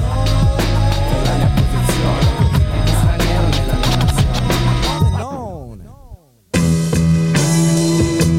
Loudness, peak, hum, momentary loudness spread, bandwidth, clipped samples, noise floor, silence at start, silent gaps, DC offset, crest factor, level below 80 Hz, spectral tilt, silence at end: -16 LUFS; -2 dBFS; none; 4 LU; 16.5 kHz; under 0.1%; -40 dBFS; 0 s; none; 0.7%; 12 dB; -20 dBFS; -5.5 dB/octave; 0 s